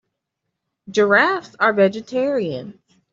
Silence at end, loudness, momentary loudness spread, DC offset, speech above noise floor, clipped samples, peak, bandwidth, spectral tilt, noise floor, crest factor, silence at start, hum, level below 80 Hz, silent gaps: 0.4 s; -18 LUFS; 10 LU; under 0.1%; 60 dB; under 0.1%; -2 dBFS; 7.6 kHz; -5.5 dB/octave; -79 dBFS; 18 dB; 0.9 s; none; -66 dBFS; none